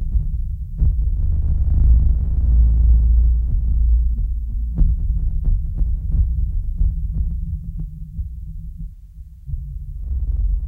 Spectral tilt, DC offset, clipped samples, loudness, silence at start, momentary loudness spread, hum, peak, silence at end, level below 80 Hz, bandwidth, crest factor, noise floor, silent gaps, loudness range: -12 dB/octave; under 0.1%; under 0.1%; -21 LUFS; 0 s; 16 LU; none; -4 dBFS; 0 s; -18 dBFS; 0.8 kHz; 14 dB; -38 dBFS; none; 10 LU